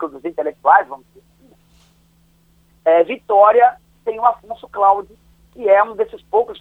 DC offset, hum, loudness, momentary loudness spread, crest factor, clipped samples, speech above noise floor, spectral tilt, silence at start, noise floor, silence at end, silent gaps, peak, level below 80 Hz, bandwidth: under 0.1%; none; -16 LUFS; 16 LU; 18 dB; under 0.1%; 39 dB; -6 dB/octave; 0 s; -55 dBFS; 0.1 s; none; 0 dBFS; -56 dBFS; 4.1 kHz